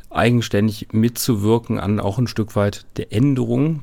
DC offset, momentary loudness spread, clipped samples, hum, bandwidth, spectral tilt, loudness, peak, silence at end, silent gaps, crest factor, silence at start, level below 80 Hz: under 0.1%; 4 LU; under 0.1%; none; 17.5 kHz; -6.5 dB/octave; -19 LUFS; -4 dBFS; 0 s; none; 16 dB; 0.05 s; -44 dBFS